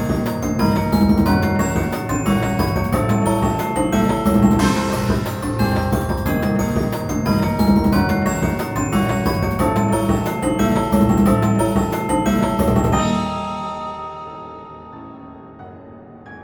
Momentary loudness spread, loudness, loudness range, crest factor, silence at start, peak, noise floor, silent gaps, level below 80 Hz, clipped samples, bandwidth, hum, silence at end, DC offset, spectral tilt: 17 LU; -18 LUFS; 4 LU; 16 dB; 0 s; -2 dBFS; -39 dBFS; none; -32 dBFS; under 0.1%; 19 kHz; none; 0 s; under 0.1%; -6.5 dB/octave